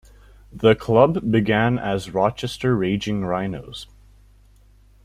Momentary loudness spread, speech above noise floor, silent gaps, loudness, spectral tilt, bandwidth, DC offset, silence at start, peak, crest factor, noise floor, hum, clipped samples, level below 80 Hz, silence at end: 11 LU; 32 dB; none; -20 LUFS; -7 dB/octave; 14 kHz; under 0.1%; 0.55 s; -2 dBFS; 20 dB; -52 dBFS; 50 Hz at -40 dBFS; under 0.1%; -46 dBFS; 1.2 s